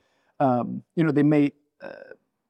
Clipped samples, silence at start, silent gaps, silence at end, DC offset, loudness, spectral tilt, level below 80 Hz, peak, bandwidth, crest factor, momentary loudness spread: under 0.1%; 0.4 s; none; 0.45 s; under 0.1%; -23 LUFS; -9.5 dB/octave; -76 dBFS; -10 dBFS; 5.6 kHz; 16 dB; 23 LU